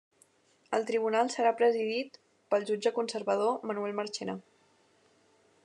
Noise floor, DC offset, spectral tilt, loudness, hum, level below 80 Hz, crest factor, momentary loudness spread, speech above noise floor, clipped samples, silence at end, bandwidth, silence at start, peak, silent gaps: -67 dBFS; under 0.1%; -4 dB/octave; -31 LUFS; none; under -90 dBFS; 18 dB; 9 LU; 37 dB; under 0.1%; 1.25 s; 10.5 kHz; 0.7 s; -14 dBFS; none